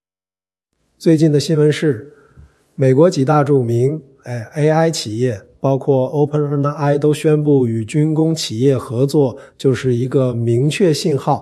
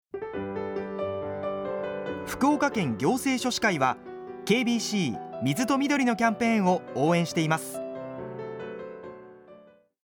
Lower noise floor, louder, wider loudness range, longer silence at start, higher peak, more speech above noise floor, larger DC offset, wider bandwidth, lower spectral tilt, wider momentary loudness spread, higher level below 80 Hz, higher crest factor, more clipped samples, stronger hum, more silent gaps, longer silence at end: first, under -90 dBFS vs -54 dBFS; first, -16 LUFS vs -27 LUFS; about the same, 2 LU vs 4 LU; first, 1 s vs 0.15 s; first, 0 dBFS vs -10 dBFS; first, over 75 dB vs 29 dB; neither; second, 12 kHz vs over 20 kHz; first, -7 dB/octave vs -5 dB/octave; second, 7 LU vs 13 LU; first, -58 dBFS vs -64 dBFS; about the same, 14 dB vs 18 dB; neither; neither; neither; second, 0 s vs 0.45 s